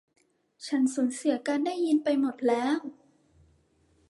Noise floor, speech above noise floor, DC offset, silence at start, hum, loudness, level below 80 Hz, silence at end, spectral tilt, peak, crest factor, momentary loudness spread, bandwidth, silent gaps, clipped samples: -66 dBFS; 39 dB; under 0.1%; 0.6 s; none; -28 LUFS; -74 dBFS; 1.15 s; -3.5 dB/octave; -14 dBFS; 16 dB; 7 LU; 11.5 kHz; none; under 0.1%